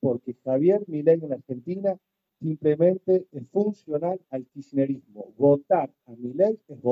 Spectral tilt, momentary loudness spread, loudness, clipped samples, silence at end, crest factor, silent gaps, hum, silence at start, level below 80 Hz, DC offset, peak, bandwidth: -11 dB/octave; 13 LU; -25 LUFS; under 0.1%; 0 s; 16 dB; none; none; 0.05 s; -72 dBFS; under 0.1%; -8 dBFS; 5.8 kHz